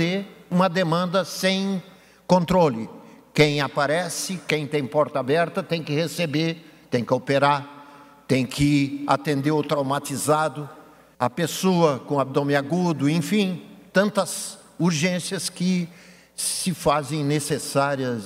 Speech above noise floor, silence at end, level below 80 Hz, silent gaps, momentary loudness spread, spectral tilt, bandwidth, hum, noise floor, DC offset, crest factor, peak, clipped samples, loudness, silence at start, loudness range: 24 dB; 0 s; -56 dBFS; none; 8 LU; -5 dB/octave; 16 kHz; none; -47 dBFS; under 0.1%; 18 dB; -4 dBFS; under 0.1%; -23 LUFS; 0 s; 2 LU